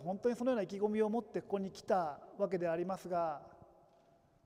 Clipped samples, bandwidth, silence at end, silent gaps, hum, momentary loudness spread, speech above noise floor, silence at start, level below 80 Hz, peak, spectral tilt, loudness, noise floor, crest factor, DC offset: under 0.1%; 15.5 kHz; 0.8 s; none; none; 6 LU; 32 dB; 0 s; -76 dBFS; -20 dBFS; -7 dB/octave; -37 LUFS; -68 dBFS; 18 dB; under 0.1%